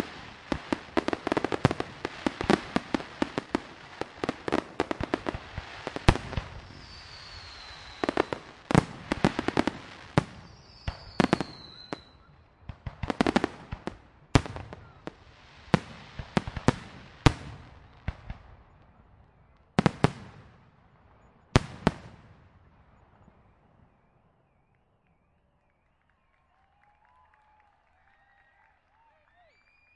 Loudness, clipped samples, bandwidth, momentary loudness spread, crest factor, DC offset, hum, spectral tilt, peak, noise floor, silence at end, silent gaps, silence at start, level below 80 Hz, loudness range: -30 LUFS; under 0.1%; 11.5 kHz; 20 LU; 32 dB; under 0.1%; none; -6 dB/octave; 0 dBFS; -70 dBFS; 7.85 s; none; 0 s; -44 dBFS; 4 LU